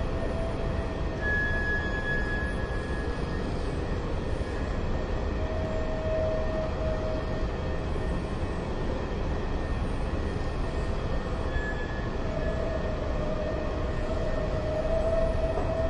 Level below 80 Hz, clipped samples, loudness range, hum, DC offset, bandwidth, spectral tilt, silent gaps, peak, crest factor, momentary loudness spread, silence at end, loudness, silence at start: -32 dBFS; under 0.1%; 2 LU; none; under 0.1%; 10 kHz; -7 dB/octave; none; -14 dBFS; 14 dB; 4 LU; 0 s; -31 LUFS; 0 s